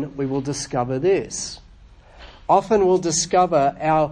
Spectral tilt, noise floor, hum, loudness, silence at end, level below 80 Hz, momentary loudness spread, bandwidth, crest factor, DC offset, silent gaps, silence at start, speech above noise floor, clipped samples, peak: -4.5 dB/octave; -47 dBFS; none; -20 LUFS; 0 s; -48 dBFS; 12 LU; 10.5 kHz; 18 dB; under 0.1%; none; 0 s; 27 dB; under 0.1%; -4 dBFS